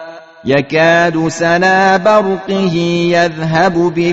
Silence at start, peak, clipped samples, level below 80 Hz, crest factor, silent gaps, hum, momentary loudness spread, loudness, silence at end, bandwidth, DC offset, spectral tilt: 0 s; 0 dBFS; under 0.1%; -48 dBFS; 12 dB; none; none; 6 LU; -12 LUFS; 0 s; 8 kHz; 0.4%; -4 dB/octave